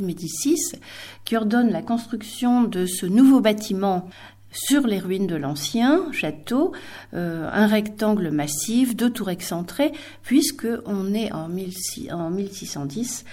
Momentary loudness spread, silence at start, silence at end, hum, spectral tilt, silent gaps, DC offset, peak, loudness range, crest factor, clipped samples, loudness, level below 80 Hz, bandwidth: 10 LU; 0 s; 0 s; none; -4.5 dB/octave; none; under 0.1%; -4 dBFS; 5 LU; 18 dB; under 0.1%; -22 LUFS; -58 dBFS; 17 kHz